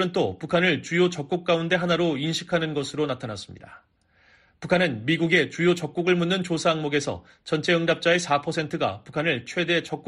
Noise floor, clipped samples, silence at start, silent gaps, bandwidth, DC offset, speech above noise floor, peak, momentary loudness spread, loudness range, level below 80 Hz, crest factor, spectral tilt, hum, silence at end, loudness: -60 dBFS; under 0.1%; 0 s; none; 11.5 kHz; under 0.1%; 35 dB; -6 dBFS; 7 LU; 4 LU; -60 dBFS; 18 dB; -5 dB/octave; none; 0.05 s; -24 LUFS